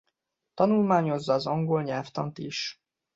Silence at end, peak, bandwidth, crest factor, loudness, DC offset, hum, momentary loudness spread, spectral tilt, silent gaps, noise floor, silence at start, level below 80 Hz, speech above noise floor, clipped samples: 0.45 s; -10 dBFS; 7.8 kHz; 18 dB; -27 LUFS; under 0.1%; none; 10 LU; -6.5 dB/octave; none; -80 dBFS; 0.55 s; -68 dBFS; 54 dB; under 0.1%